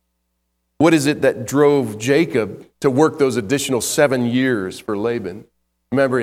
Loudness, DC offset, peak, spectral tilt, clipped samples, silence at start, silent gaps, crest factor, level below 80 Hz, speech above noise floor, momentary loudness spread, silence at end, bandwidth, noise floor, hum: -18 LUFS; under 0.1%; 0 dBFS; -5 dB/octave; under 0.1%; 0.8 s; none; 18 dB; -56 dBFS; 54 dB; 8 LU; 0 s; 16 kHz; -71 dBFS; none